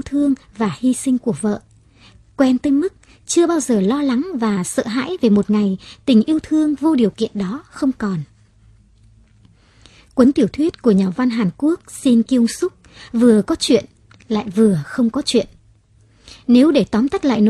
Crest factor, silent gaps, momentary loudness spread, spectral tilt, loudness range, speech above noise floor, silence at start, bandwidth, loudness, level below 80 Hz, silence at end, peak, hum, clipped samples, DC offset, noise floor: 18 dB; none; 10 LU; -5.5 dB/octave; 4 LU; 36 dB; 0.05 s; 13 kHz; -17 LUFS; -50 dBFS; 0 s; 0 dBFS; none; under 0.1%; under 0.1%; -52 dBFS